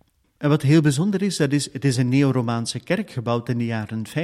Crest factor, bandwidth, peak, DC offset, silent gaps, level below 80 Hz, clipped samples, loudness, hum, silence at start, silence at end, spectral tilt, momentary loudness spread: 14 dB; 13 kHz; -6 dBFS; under 0.1%; none; -58 dBFS; under 0.1%; -21 LUFS; none; 0.4 s; 0 s; -6 dB/octave; 9 LU